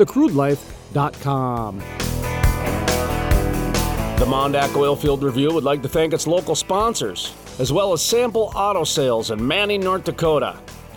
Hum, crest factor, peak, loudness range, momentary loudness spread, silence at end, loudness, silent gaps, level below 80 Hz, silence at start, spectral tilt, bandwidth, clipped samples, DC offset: none; 18 dB; -2 dBFS; 2 LU; 8 LU; 0 s; -20 LUFS; none; -30 dBFS; 0 s; -5 dB/octave; 19.5 kHz; under 0.1%; under 0.1%